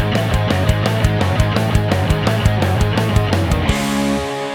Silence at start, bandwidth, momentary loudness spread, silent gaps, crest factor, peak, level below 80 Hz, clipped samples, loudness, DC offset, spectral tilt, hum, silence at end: 0 s; 17 kHz; 2 LU; none; 14 dB; 0 dBFS; -24 dBFS; under 0.1%; -17 LUFS; under 0.1%; -6 dB/octave; none; 0 s